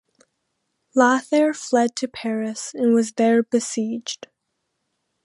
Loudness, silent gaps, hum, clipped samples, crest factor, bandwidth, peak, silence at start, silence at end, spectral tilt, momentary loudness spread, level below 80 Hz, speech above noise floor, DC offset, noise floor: -21 LUFS; none; none; under 0.1%; 20 dB; 11.5 kHz; -2 dBFS; 0.95 s; 1.1 s; -4 dB/octave; 10 LU; -72 dBFS; 56 dB; under 0.1%; -76 dBFS